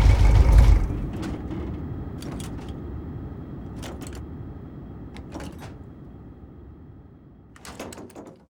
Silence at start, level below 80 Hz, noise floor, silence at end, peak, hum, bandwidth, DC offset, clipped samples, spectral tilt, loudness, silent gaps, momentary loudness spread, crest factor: 0 s; -26 dBFS; -48 dBFS; 0.2 s; -4 dBFS; none; 11 kHz; under 0.1%; under 0.1%; -7 dB/octave; -26 LUFS; none; 26 LU; 20 dB